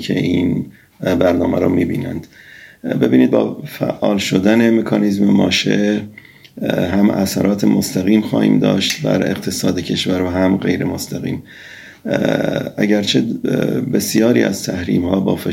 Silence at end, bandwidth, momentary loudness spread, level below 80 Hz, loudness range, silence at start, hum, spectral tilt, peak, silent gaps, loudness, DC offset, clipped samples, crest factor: 0 s; 16.5 kHz; 10 LU; -48 dBFS; 3 LU; 0 s; none; -5.5 dB/octave; 0 dBFS; none; -16 LUFS; under 0.1%; under 0.1%; 16 dB